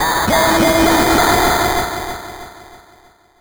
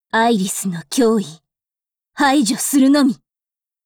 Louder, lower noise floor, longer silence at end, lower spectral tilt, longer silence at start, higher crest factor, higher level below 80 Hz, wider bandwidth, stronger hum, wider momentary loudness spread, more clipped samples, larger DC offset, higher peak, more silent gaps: first, -13 LUFS vs -16 LUFS; second, -49 dBFS vs under -90 dBFS; about the same, 0.65 s vs 0.7 s; about the same, -3.5 dB/octave vs -4 dB/octave; second, 0 s vs 0.15 s; about the same, 14 dB vs 12 dB; first, -32 dBFS vs -60 dBFS; about the same, over 20 kHz vs 20 kHz; neither; first, 16 LU vs 9 LU; neither; neither; first, -2 dBFS vs -6 dBFS; neither